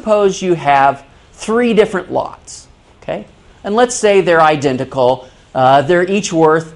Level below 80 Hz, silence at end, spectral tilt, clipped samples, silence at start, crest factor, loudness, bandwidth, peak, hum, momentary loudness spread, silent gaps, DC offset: -46 dBFS; 0 s; -5 dB/octave; under 0.1%; 0.05 s; 14 dB; -13 LUFS; 11.5 kHz; 0 dBFS; none; 17 LU; none; under 0.1%